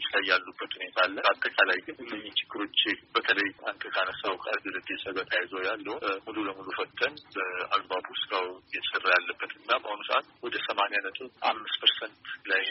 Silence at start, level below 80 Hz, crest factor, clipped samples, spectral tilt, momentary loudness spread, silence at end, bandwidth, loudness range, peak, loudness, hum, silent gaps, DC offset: 0 s; -74 dBFS; 22 dB; under 0.1%; 2 dB/octave; 10 LU; 0 s; 5.8 kHz; 4 LU; -8 dBFS; -29 LUFS; none; none; under 0.1%